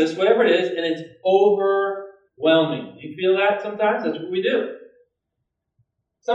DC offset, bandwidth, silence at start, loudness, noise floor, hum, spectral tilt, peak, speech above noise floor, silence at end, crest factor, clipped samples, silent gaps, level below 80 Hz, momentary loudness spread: under 0.1%; 8 kHz; 0 s; -20 LUFS; -79 dBFS; none; -6 dB/octave; -4 dBFS; 59 dB; 0 s; 18 dB; under 0.1%; none; -78 dBFS; 11 LU